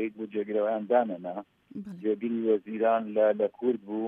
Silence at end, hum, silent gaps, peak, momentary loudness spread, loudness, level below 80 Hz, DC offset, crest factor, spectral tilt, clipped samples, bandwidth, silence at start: 0 s; none; none; -10 dBFS; 14 LU; -28 LUFS; -80 dBFS; under 0.1%; 18 dB; -9 dB/octave; under 0.1%; 3.8 kHz; 0 s